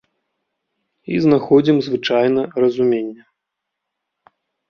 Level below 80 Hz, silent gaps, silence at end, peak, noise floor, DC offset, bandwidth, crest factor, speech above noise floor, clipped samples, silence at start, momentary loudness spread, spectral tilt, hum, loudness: -60 dBFS; none; 1.55 s; -2 dBFS; -80 dBFS; under 0.1%; 6.8 kHz; 18 dB; 64 dB; under 0.1%; 1.1 s; 8 LU; -7.5 dB/octave; none; -16 LUFS